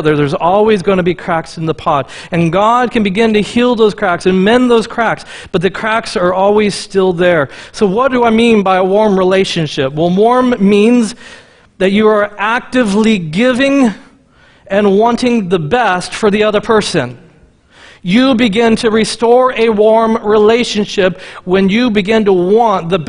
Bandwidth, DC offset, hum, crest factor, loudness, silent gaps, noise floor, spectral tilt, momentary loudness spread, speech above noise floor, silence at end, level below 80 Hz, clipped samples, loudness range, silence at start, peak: 10.5 kHz; under 0.1%; none; 12 dB; -11 LUFS; none; -46 dBFS; -5.5 dB/octave; 7 LU; 35 dB; 0 s; -42 dBFS; under 0.1%; 2 LU; 0 s; 0 dBFS